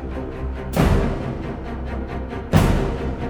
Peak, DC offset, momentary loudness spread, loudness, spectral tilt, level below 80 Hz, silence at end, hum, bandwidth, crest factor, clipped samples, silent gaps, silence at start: -2 dBFS; under 0.1%; 11 LU; -23 LUFS; -7 dB/octave; -26 dBFS; 0 s; none; over 20 kHz; 20 dB; under 0.1%; none; 0 s